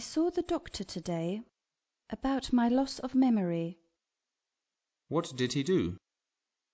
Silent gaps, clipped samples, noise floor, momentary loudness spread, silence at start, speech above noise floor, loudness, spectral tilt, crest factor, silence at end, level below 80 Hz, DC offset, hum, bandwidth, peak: none; under 0.1%; -90 dBFS; 12 LU; 0 s; 59 dB; -32 LUFS; -6 dB/octave; 16 dB; 0.75 s; -58 dBFS; under 0.1%; none; 8 kHz; -16 dBFS